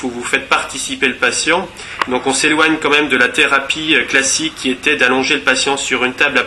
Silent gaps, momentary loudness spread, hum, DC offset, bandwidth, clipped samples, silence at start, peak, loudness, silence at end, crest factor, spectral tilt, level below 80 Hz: none; 6 LU; none; under 0.1%; 13 kHz; under 0.1%; 0 s; 0 dBFS; -13 LUFS; 0 s; 16 dB; -1.5 dB/octave; -48 dBFS